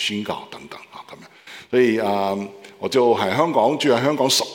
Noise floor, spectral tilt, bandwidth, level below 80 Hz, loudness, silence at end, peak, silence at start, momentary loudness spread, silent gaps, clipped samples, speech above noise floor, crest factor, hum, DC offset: -43 dBFS; -4 dB/octave; 17 kHz; -70 dBFS; -19 LUFS; 0 s; -4 dBFS; 0 s; 20 LU; none; under 0.1%; 23 dB; 18 dB; none; under 0.1%